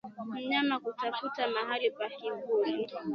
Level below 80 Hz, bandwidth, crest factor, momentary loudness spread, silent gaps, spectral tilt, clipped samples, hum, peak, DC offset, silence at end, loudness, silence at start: -82 dBFS; 6.2 kHz; 18 dB; 8 LU; none; -6 dB/octave; under 0.1%; none; -14 dBFS; under 0.1%; 0 s; -33 LUFS; 0.05 s